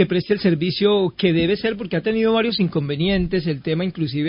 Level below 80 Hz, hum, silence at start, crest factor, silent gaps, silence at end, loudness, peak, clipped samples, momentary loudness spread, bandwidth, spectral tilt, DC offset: -44 dBFS; none; 0 s; 16 dB; none; 0 s; -20 LUFS; -4 dBFS; under 0.1%; 5 LU; 5.4 kHz; -11 dB/octave; under 0.1%